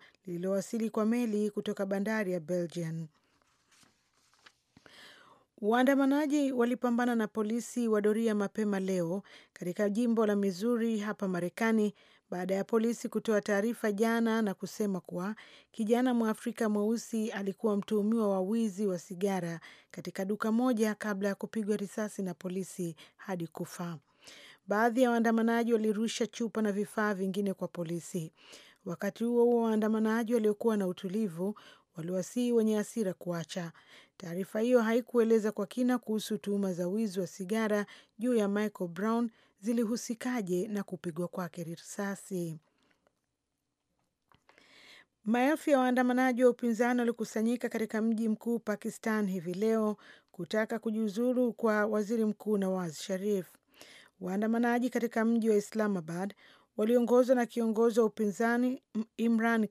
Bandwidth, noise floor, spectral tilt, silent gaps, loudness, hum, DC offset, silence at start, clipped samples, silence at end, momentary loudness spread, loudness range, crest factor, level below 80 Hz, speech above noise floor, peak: 15 kHz; -84 dBFS; -6 dB/octave; none; -31 LUFS; none; under 0.1%; 0.25 s; under 0.1%; 0.05 s; 12 LU; 6 LU; 18 dB; -86 dBFS; 53 dB; -14 dBFS